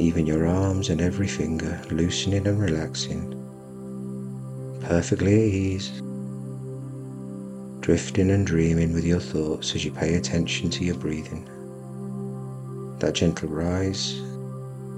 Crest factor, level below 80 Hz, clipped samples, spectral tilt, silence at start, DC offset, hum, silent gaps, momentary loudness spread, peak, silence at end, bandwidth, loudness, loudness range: 18 dB; -44 dBFS; under 0.1%; -5.5 dB/octave; 0 s; under 0.1%; none; none; 14 LU; -6 dBFS; 0 s; 11.5 kHz; -26 LUFS; 4 LU